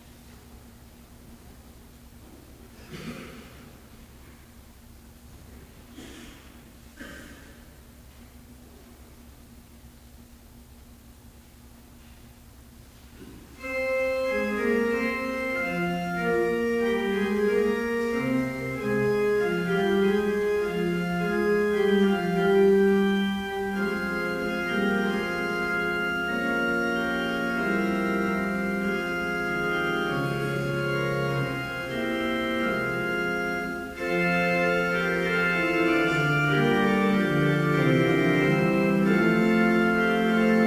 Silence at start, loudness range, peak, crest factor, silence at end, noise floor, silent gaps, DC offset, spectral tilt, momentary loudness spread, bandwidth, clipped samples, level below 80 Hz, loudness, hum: 0.05 s; 23 LU; -8 dBFS; 18 dB; 0 s; -50 dBFS; none; under 0.1%; -6.5 dB/octave; 9 LU; 16 kHz; under 0.1%; -52 dBFS; -25 LUFS; none